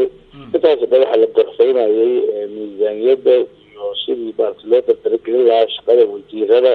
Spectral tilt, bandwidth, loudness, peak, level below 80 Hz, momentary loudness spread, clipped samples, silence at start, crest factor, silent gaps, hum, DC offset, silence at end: -6.5 dB/octave; 4.5 kHz; -15 LUFS; 0 dBFS; -60 dBFS; 10 LU; under 0.1%; 0 s; 14 dB; none; none; under 0.1%; 0 s